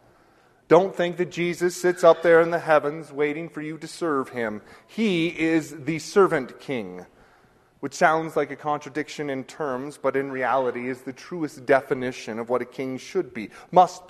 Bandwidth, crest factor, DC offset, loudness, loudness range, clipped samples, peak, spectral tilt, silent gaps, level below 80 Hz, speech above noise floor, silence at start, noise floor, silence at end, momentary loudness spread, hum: 13.5 kHz; 22 dB; under 0.1%; -24 LUFS; 6 LU; under 0.1%; -2 dBFS; -5.5 dB/octave; none; -66 dBFS; 35 dB; 0.7 s; -58 dBFS; 0.1 s; 14 LU; none